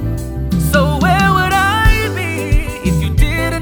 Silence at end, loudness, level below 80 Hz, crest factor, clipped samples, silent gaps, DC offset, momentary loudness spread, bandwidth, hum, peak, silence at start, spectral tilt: 0 s; -14 LUFS; -18 dBFS; 14 dB; under 0.1%; none; under 0.1%; 7 LU; over 20 kHz; none; 0 dBFS; 0 s; -5.5 dB/octave